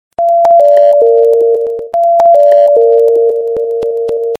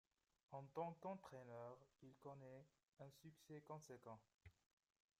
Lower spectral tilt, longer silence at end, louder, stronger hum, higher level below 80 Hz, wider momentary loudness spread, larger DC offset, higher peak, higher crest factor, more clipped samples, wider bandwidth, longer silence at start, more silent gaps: second, -5 dB/octave vs -6.5 dB/octave; second, 0.05 s vs 0.7 s; first, -8 LUFS vs -59 LUFS; neither; first, -54 dBFS vs -88 dBFS; second, 9 LU vs 14 LU; neither; first, 0 dBFS vs -38 dBFS; second, 8 dB vs 22 dB; first, 0.3% vs under 0.1%; second, 6.4 kHz vs 15 kHz; second, 0.2 s vs 0.5 s; neither